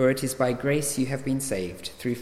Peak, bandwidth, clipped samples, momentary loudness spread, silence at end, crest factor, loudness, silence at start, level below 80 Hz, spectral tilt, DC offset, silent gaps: -10 dBFS; 16 kHz; under 0.1%; 7 LU; 0 s; 16 dB; -27 LUFS; 0 s; -52 dBFS; -5 dB/octave; under 0.1%; none